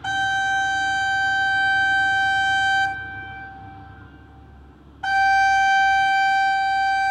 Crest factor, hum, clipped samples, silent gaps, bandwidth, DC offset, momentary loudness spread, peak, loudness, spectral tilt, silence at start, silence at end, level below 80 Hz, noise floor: 10 dB; none; under 0.1%; none; 10.5 kHz; under 0.1%; 15 LU; -10 dBFS; -19 LUFS; -1 dB/octave; 0 s; 0 s; -50 dBFS; -46 dBFS